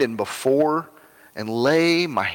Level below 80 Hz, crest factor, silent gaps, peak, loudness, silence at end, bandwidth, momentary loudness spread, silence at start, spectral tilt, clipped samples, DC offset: -66 dBFS; 14 dB; none; -8 dBFS; -21 LUFS; 0 s; 18 kHz; 12 LU; 0 s; -5 dB/octave; under 0.1%; under 0.1%